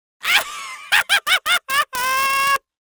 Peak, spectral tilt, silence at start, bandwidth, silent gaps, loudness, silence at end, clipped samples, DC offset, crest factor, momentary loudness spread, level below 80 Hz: -2 dBFS; 2 dB/octave; 0.25 s; over 20 kHz; none; -17 LUFS; 0.25 s; under 0.1%; under 0.1%; 18 dB; 4 LU; -58 dBFS